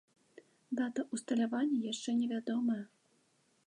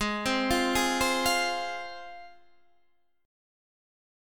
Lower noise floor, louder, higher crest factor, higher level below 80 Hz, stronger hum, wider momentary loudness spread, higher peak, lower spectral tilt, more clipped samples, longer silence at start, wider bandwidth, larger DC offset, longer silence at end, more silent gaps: about the same, -73 dBFS vs -72 dBFS; second, -36 LUFS vs -27 LUFS; about the same, 14 dB vs 18 dB; second, -88 dBFS vs -50 dBFS; neither; second, 7 LU vs 16 LU; second, -24 dBFS vs -14 dBFS; first, -4.5 dB/octave vs -2.5 dB/octave; neither; first, 0.7 s vs 0 s; second, 11 kHz vs 17.5 kHz; second, under 0.1% vs 0.3%; second, 0.8 s vs 1 s; neither